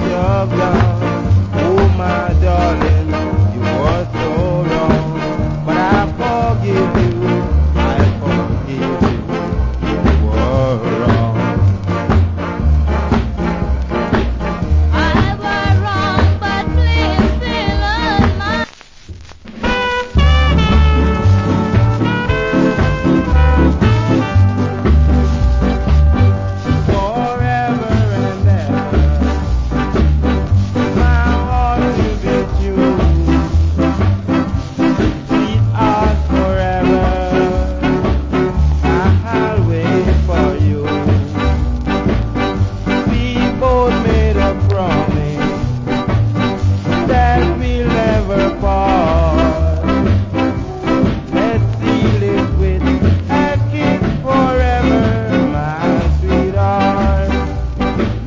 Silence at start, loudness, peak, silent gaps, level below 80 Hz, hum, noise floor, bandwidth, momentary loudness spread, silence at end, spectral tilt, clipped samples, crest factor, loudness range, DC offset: 0 s; -15 LUFS; 0 dBFS; none; -18 dBFS; none; -34 dBFS; 7.6 kHz; 5 LU; 0 s; -8 dB/octave; under 0.1%; 12 dB; 2 LU; under 0.1%